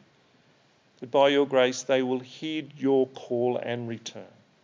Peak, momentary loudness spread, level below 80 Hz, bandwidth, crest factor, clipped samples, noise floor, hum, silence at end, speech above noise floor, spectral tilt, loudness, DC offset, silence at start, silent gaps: -8 dBFS; 15 LU; -82 dBFS; 7.6 kHz; 18 dB; under 0.1%; -62 dBFS; none; 0.4 s; 37 dB; -4.5 dB/octave; -26 LUFS; under 0.1%; 1 s; none